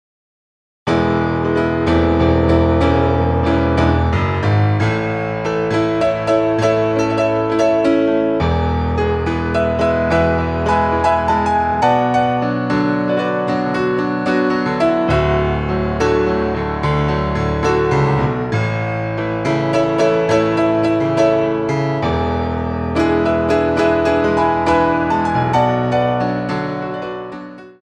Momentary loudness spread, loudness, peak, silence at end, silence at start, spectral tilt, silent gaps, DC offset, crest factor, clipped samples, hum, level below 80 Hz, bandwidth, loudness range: 5 LU; -16 LUFS; -2 dBFS; 0.1 s; 0.85 s; -7.5 dB/octave; none; under 0.1%; 14 dB; under 0.1%; none; -30 dBFS; 9.8 kHz; 2 LU